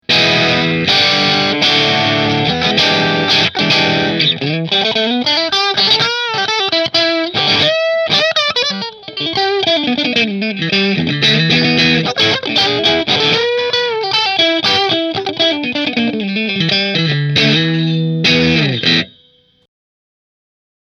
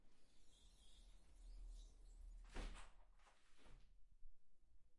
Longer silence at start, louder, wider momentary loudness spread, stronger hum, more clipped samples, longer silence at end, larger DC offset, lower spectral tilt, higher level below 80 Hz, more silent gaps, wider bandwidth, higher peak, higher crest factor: about the same, 0.1 s vs 0 s; first, -12 LUFS vs -62 LUFS; second, 5 LU vs 10 LU; neither; neither; first, 1.75 s vs 0 s; neither; about the same, -4.5 dB/octave vs -4 dB/octave; first, -48 dBFS vs -62 dBFS; neither; about the same, 10 kHz vs 11 kHz; first, 0 dBFS vs -40 dBFS; second, 14 dB vs 20 dB